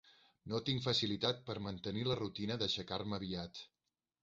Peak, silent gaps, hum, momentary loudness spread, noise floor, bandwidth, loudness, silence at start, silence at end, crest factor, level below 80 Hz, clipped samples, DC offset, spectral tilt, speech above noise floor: -20 dBFS; none; none; 12 LU; under -90 dBFS; 7.6 kHz; -38 LUFS; 0.05 s; 0.55 s; 20 dB; -64 dBFS; under 0.1%; under 0.1%; -4 dB/octave; over 51 dB